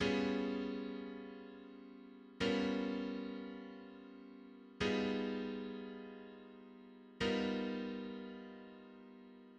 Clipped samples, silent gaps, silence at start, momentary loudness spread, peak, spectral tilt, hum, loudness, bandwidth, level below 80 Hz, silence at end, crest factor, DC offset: under 0.1%; none; 0 s; 20 LU; -22 dBFS; -6 dB/octave; none; -41 LUFS; 9.2 kHz; -68 dBFS; 0 s; 20 dB; under 0.1%